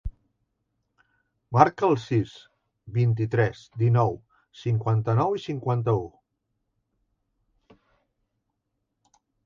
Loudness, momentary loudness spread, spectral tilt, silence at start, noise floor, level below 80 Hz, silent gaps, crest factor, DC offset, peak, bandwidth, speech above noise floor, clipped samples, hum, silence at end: -25 LUFS; 12 LU; -8.5 dB/octave; 0.05 s; -79 dBFS; -50 dBFS; none; 26 dB; under 0.1%; 0 dBFS; 7.2 kHz; 56 dB; under 0.1%; none; 3.4 s